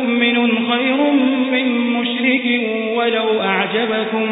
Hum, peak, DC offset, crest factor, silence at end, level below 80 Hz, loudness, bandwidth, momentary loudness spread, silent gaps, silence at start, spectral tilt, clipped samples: none; -4 dBFS; under 0.1%; 14 dB; 0 s; -72 dBFS; -16 LUFS; 4 kHz; 3 LU; none; 0 s; -10 dB/octave; under 0.1%